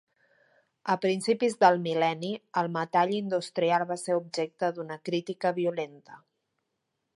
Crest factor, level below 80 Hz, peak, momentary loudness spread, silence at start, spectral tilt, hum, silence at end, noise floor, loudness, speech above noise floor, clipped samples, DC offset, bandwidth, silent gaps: 22 dB; -80 dBFS; -6 dBFS; 10 LU; 0.85 s; -5 dB/octave; none; 1 s; -81 dBFS; -28 LUFS; 53 dB; under 0.1%; under 0.1%; 11.5 kHz; none